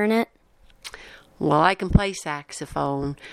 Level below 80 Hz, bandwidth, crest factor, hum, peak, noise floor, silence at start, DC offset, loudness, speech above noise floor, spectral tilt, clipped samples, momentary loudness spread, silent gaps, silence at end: -36 dBFS; 14.5 kHz; 22 dB; none; -2 dBFS; -55 dBFS; 0 s; under 0.1%; -23 LUFS; 33 dB; -6 dB/octave; under 0.1%; 20 LU; none; 0 s